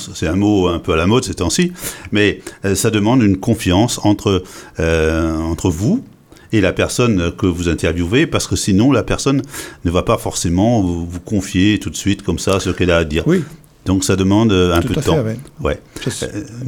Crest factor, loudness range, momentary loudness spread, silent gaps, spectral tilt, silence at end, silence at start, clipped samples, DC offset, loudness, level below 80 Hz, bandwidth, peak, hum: 14 dB; 2 LU; 9 LU; none; -5.5 dB/octave; 0 s; 0 s; under 0.1%; under 0.1%; -16 LUFS; -34 dBFS; 18.5 kHz; -2 dBFS; none